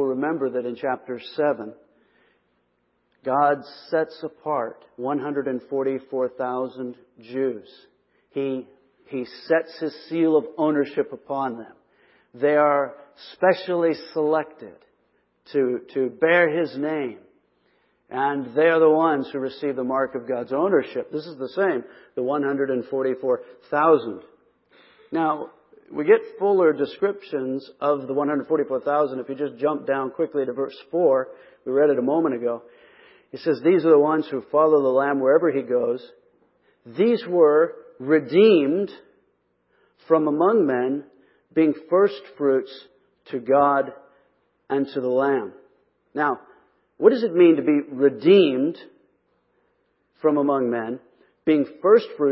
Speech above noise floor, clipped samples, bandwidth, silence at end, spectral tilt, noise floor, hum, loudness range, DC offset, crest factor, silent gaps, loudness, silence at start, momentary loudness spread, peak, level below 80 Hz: 48 dB; under 0.1%; 5.8 kHz; 0 s; -10.5 dB/octave; -69 dBFS; none; 7 LU; under 0.1%; 20 dB; none; -22 LUFS; 0 s; 14 LU; -2 dBFS; -74 dBFS